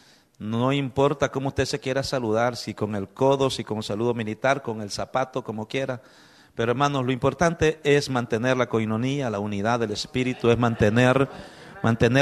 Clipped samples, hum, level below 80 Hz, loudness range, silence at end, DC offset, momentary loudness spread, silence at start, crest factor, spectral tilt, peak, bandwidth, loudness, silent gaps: under 0.1%; none; -52 dBFS; 4 LU; 0 s; under 0.1%; 9 LU; 0.4 s; 18 dB; -6 dB/octave; -6 dBFS; 13.5 kHz; -24 LUFS; none